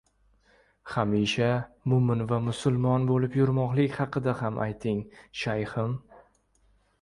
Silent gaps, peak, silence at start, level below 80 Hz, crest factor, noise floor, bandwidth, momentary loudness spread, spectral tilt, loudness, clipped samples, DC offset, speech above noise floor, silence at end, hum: none; -10 dBFS; 0.85 s; -56 dBFS; 18 dB; -66 dBFS; 11 kHz; 8 LU; -7 dB/octave; -27 LUFS; under 0.1%; under 0.1%; 39 dB; 0.8 s; none